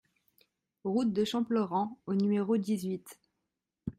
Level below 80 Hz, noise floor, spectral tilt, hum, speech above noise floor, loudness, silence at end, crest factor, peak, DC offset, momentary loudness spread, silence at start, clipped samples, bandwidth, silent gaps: -68 dBFS; -86 dBFS; -7 dB/octave; none; 55 dB; -32 LUFS; 0.1 s; 14 dB; -18 dBFS; under 0.1%; 10 LU; 0.85 s; under 0.1%; 15.5 kHz; none